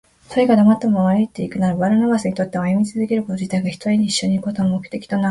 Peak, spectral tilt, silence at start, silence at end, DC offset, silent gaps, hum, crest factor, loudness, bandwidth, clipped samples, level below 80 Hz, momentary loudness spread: -2 dBFS; -6.5 dB/octave; 0.3 s; 0 s; under 0.1%; none; none; 16 dB; -18 LUFS; 11.5 kHz; under 0.1%; -54 dBFS; 8 LU